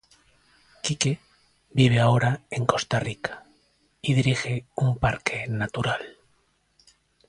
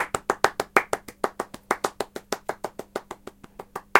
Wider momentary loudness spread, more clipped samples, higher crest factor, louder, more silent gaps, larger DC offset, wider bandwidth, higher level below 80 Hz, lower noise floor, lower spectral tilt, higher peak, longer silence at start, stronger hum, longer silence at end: second, 12 LU vs 18 LU; neither; second, 22 dB vs 28 dB; first, -25 LUFS vs -28 LUFS; neither; neither; second, 11 kHz vs 17 kHz; first, -50 dBFS vs -58 dBFS; first, -67 dBFS vs -44 dBFS; first, -5 dB/octave vs -2.5 dB/octave; second, -4 dBFS vs 0 dBFS; first, 0.85 s vs 0 s; neither; first, 1.2 s vs 0 s